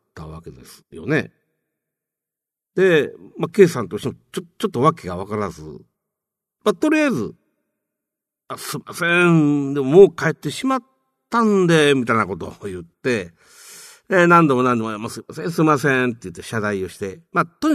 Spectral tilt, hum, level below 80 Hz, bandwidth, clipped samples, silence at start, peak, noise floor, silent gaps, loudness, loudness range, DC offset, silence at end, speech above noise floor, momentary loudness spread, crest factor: -6 dB/octave; none; -56 dBFS; 13.5 kHz; under 0.1%; 0.15 s; 0 dBFS; -87 dBFS; none; -18 LUFS; 7 LU; under 0.1%; 0 s; 69 dB; 19 LU; 20 dB